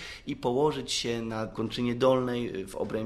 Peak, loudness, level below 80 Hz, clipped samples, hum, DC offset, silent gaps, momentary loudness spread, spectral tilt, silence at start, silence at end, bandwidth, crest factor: -10 dBFS; -29 LUFS; -54 dBFS; under 0.1%; none; under 0.1%; none; 9 LU; -5 dB/octave; 0 s; 0 s; 13.5 kHz; 20 dB